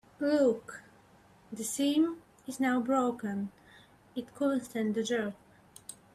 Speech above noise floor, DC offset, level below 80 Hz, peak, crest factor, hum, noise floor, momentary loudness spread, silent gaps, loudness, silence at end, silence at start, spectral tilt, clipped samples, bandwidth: 30 dB; under 0.1%; -72 dBFS; -16 dBFS; 16 dB; none; -60 dBFS; 20 LU; none; -31 LUFS; 0.2 s; 0.2 s; -4.5 dB/octave; under 0.1%; 15 kHz